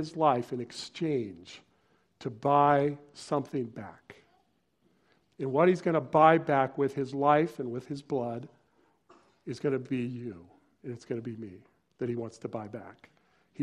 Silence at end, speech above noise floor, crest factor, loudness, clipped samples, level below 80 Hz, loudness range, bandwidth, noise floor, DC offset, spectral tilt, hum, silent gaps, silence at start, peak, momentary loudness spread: 0 s; 42 dB; 24 dB; -29 LUFS; under 0.1%; -72 dBFS; 11 LU; 11.5 kHz; -72 dBFS; under 0.1%; -7 dB/octave; none; none; 0 s; -8 dBFS; 20 LU